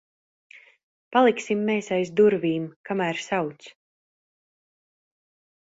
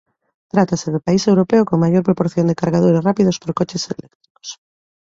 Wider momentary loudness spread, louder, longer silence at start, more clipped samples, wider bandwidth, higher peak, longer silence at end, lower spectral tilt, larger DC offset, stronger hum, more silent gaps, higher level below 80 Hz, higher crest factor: second, 9 LU vs 16 LU; second, -24 LUFS vs -17 LUFS; first, 1.1 s vs 0.55 s; neither; about the same, 8 kHz vs 7.8 kHz; second, -6 dBFS vs -2 dBFS; first, 2.1 s vs 0.55 s; about the same, -5.5 dB/octave vs -6.5 dB/octave; neither; neither; about the same, 2.76-2.84 s vs 4.15-4.20 s, 4.30-4.35 s; second, -70 dBFS vs -52 dBFS; about the same, 20 dB vs 16 dB